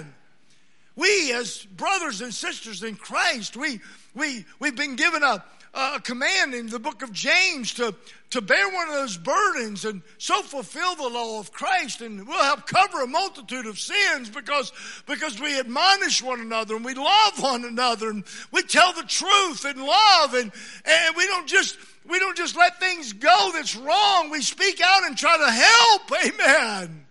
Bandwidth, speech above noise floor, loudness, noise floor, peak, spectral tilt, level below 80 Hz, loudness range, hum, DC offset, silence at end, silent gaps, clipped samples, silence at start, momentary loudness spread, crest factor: 11.5 kHz; 39 dB; -21 LUFS; -62 dBFS; 0 dBFS; -1 dB/octave; -78 dBFS; 8 LU; none; 0.3%; 0.1 s; none; under 0.1%; 0 s; 13 LU; 22 dB